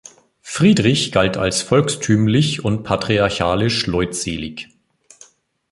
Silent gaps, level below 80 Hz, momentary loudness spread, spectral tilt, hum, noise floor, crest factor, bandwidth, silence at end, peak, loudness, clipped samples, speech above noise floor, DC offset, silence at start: none; -42 dBFS; 9 LU; -5 dB/octave; none; -50 dBFS; 16 dB; 11.5 kHz; 1.1 s; -2 dBFS; -17 LUFS; under 0.1%; 33 dB; under 0.1%; 0.45 s